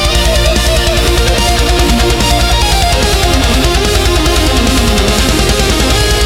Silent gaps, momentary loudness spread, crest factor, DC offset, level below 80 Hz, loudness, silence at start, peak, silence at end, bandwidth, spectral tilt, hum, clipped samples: none; 0 LU; 10 dB; under 0.1%; -14 dBFS; -10 LUFS; 0 s; 0 dBFS; 0 s; 16.5 kHz; -4 dB/octave; none; under 0.1%